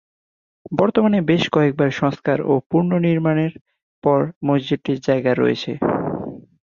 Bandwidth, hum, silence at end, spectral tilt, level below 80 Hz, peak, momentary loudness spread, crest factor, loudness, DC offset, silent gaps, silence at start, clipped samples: 7.2 kHz; none; 0.25 s; -7.5 dB/octave; -56 dBFS; -2 dBFS; 7 LU; 16 dB; -19 LUFS; under 0.1%; 2.66-2.70 s, 3.61-3.65 s, 3.83-4.02 s, 4.36-4.41 s; 0.7 s; under 0.1%